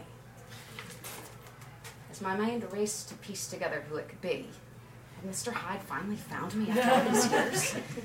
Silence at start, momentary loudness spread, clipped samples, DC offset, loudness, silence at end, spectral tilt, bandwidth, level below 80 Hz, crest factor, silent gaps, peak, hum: 0 s; 23 LU; under 0.1%; under 0.1%; -32 LUFS; 0 s; -3.5 dB/octave; 16.5 kHz; -64 dBFS; 22 dB; none; -12 dBFS; none